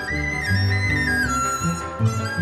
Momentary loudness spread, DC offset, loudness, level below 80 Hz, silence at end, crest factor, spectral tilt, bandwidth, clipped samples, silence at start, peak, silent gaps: 4 LU; under 0.1%; -21 LUFS; -36 dBFS; 0 s; 12 dB; -4.5 dB/octave; 13.5 kHz; under 0.1%; 0 s; -8 dBFS; none